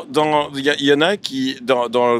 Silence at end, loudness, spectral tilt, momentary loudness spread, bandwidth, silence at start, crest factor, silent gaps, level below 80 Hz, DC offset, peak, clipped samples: 0 s; -17 LUFS; -4.5 dB/octave; 7 LU; 14.5 kHz; 0 s; 16 dB; none; -64 dBFS; under 0.1%; -2 dBFS; under 0.1%